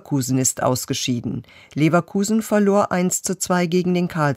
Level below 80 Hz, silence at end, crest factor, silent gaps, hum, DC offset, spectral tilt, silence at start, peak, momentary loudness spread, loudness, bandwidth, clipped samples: -56 dBFS; 0 s; 14 dB; none; none; under 0.1%; -5 dB/octave; 0.05 s; -4 dBFS; 6 LU; -20 LUFS; 16 kHz; under 0.1%